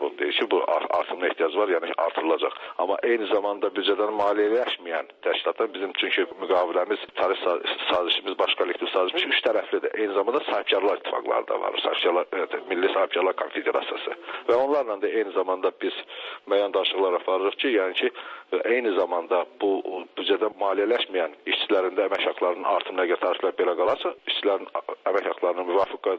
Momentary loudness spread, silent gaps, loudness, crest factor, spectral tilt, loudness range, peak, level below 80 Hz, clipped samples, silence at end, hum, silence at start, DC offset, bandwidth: 5 LU; none; -25 LUFS; 14 dB; -4.5 dB/octave; 1 LU; -10 dBFS; -74 dBFS; under 0.1%; 0 s; none; 0 s; under 0.1%; 6.4 kHz